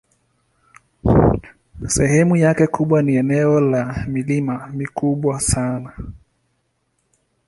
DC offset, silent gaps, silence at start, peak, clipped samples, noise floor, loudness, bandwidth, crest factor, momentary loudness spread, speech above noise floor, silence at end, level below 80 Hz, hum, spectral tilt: under 0.1%; none; 1.05 s; -2 dBFS; under 0.1%; -68 dBFS; -18 LUFS; 11.5 kHz; 18 dB; 12 LU; 51 dB; 1.3 s; -36 dBFS; none; -6.5 dB/octave